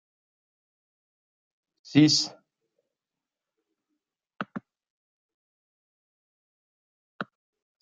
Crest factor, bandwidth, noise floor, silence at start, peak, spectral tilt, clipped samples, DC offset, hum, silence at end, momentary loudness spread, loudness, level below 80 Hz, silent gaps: 26 dB; 9 kHz; -90 dBFS; 1.9 s; -8 dBFS; -4 dB/octave; under 0.1%; under 0.1%; none; 0.6 s; 21 LU; -22 LUFS; -74 dBFS; 4.90-7.19 s